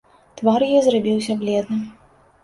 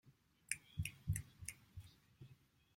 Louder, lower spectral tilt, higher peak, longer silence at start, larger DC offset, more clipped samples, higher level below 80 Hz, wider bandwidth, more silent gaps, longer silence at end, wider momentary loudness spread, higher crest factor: first, -19 LUFS vs -47 LUFS; first, -6 dB/octave vs -3 dB/octave; first, -4 dBFS vs -18 dBFS; first, 0.35 s vs 0.05 s; neither; neither; about the same, -60 dBFS vs -62 dBFS; second, 11.5 kHz vs 16.5 kHz; neither; about the same, 0.5 s vs 0.4 s; second, 11 LU vs 20 LU; second, 16 dB vs 32 dB